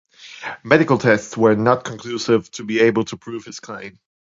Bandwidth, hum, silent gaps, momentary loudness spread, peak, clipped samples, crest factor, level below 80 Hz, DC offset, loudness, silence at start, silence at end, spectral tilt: 7.8 kHz; none; none; 18 LU; 0 dBFS; under 0.1%; 20 dB; -58 dBFS; under 0.1%; -18 LUFS; 0.2 s; 0.45 s; -5.5 dB/octave